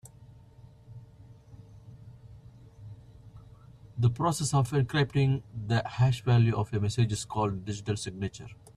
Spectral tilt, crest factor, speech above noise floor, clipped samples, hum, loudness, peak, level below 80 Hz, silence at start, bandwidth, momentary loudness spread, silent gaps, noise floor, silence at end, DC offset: -6 dB/octave; 18 dB; 26 dB; under 0.1%; none; -29 LUFS; -14 dBFS; -54 dBFS; 0.05 s; 13 kHz; 26 LU; none; -53 dBFS; 0.2 s; under 0.1%